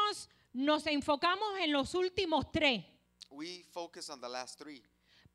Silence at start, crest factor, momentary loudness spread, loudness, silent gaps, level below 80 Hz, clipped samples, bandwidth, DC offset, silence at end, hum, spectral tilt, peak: 0 s; 20 dB; 16 LU; -34 LUFS; none; -62 dBFS; under 0.1%; 13 kHz; under 0.1%; 0.55 s; 60 Hz at -70 dBFS; -3.5 dB/octave; -16 dBFS